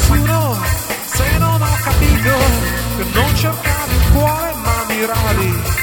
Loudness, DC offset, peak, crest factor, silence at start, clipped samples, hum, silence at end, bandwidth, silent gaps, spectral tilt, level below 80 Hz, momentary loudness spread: -15 LUFS; under 0.1%; 0 dBFS; 14 dB; 0 s; under 0.1%; none; 0 s; over 20 kHz; none; -4.5 dB/octave; -20 dBFS; 5 LU